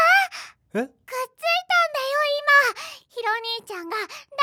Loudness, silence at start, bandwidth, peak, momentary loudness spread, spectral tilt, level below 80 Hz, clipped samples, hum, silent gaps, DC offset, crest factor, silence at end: -22 LUFS; 0 s; over 20 kHz; -6 dBFS; 15 LU; -1.5 dB/octave; -78 dBFS; under 0.1%; none; none; under 0.1%; 16 dB; 0 s